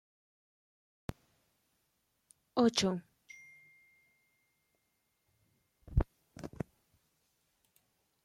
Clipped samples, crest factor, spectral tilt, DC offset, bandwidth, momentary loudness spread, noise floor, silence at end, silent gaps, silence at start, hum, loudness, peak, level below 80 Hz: under 0.1%; 24 dB; -5 dB/octave; under 0.1%; 15 kHz; 24 LU; -80 dBFS; 1.75 s; none; 2.55 s; none; -35 LUFS; -16 dBFS; -50 dBFS